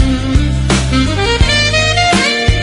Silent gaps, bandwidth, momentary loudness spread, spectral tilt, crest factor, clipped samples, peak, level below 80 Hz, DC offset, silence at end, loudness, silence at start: none; 11 kHz; 4 LU; -4.5 dB/octave; 12 dB; under 0.1%; 0 dBFS; -18 dBFS; under 0.1%; 0 s; -11 LUFS; 0 s